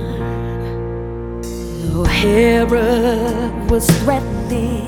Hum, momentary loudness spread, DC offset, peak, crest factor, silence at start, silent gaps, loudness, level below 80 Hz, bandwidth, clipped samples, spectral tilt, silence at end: none; 13 LU; under 0.1%; 0 dBFS; 16 dB; 0 s; none; -17 LUFS; -26 dBFS; over 20 kHz; under 0.1%; -5.5 dB/octave; 0 s